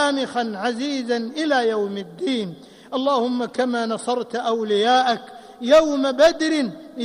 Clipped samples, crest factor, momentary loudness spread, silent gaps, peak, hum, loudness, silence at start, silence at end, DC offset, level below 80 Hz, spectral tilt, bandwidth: under 0.1%; 16 dB; 11 LU; none; -6 dBFS; none; -21 LUFS; 0 s; 0 s; under 0.1%; -58 dBFS; -4 dB/octave; 12 kHz